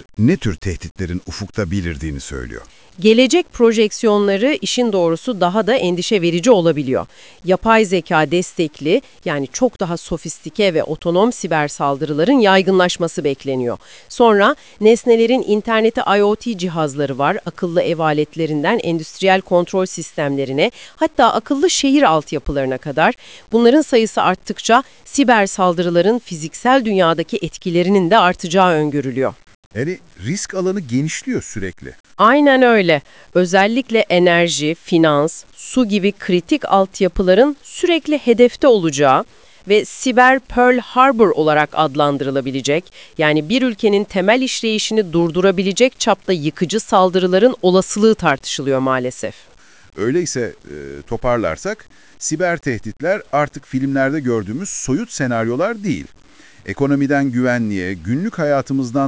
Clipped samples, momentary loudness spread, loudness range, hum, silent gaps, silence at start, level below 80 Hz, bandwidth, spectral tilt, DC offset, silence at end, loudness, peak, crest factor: under 0.1%; 11 LU; 6 LU; none; 0.91-0.95 s, 29.55-29.71 s, 32.00-32.04 s; 0.2 s; -42 dBFS; 8 kHz; -5 dB/octave; 0.4%; 0 s; -16 LUFS; 0 dBFS; 16 dB